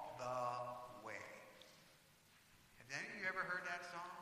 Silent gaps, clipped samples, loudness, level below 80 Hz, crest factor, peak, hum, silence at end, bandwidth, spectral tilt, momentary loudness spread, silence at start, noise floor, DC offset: none; under 0.1%; -46 LUFS; -82 dBFS; 20 dB; -30 dBFS; none; 0 s; 15.5 kHz; -3.5 dB/octave; 24 LU; 0 s; -70 dBFS; under 0.1%